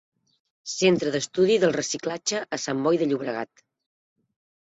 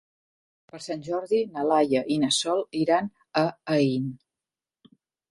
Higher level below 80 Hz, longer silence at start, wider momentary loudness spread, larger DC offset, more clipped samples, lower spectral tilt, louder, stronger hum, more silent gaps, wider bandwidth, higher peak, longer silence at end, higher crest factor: about the same, -66 dBFS vs -70 dBFS; about the same, 0.65 s vs 0.75 s; first, 13 LU vs 10 LU; neither; neither; about the same, -4 dB/octave vs -4.5 dB/octave; about the same, -24 LUFS vs -25 LUFS; neither; neither; second, 8.2 kHz vs 11.5 kHz; about the same, -8 dBFS vs -8 dBFS; about the same, 1.25 s vs 1.15 s; about the same, 18 dB vs 18 dB